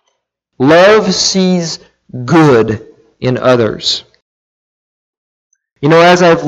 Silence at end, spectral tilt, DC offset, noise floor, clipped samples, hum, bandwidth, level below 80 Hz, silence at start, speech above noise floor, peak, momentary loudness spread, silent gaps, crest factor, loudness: 0 s; -4.5 dB/octave; under 0.1%; -67 dBFS; under 0.1%; none; 9.8 kHz; -48 dBFS; 0.6 s; 58 dB; 0 dBFS; 15 LU; 4.22-5.50 s; 12 dB; -10 LUFS